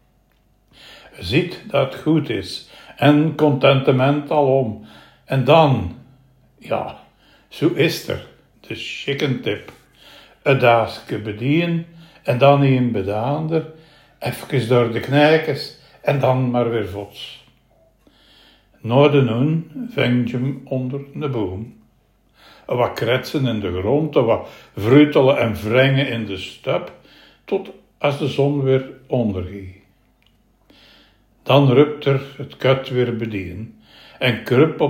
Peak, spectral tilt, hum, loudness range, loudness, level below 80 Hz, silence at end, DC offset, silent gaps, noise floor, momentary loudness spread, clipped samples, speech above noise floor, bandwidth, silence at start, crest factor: 0 dBFS; -7.5 dB/octave; none; 6 LU; -19 LUFS; -54 dBFS; 0 s; under 0.1%; none; -59 dBFS; 16 LU; under 0.1%; 41 dB; 16 kHz; 0.9 s; 20 dB